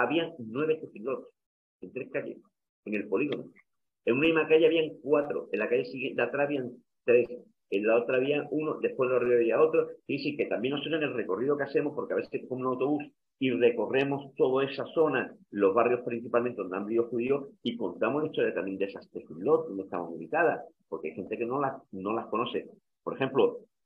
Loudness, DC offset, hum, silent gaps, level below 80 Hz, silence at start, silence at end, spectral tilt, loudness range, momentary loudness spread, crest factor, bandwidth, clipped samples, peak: -29 LUFS; under 0.1%; none; 1.46-1.80 s, 2.69-2.83 s; -76 dBFS; 0 s; 0.25 s; -8 dB/octave; 5 LU; 12 LU; 18 dB; 5.2 kHz; under 0.1%; -10 dBFS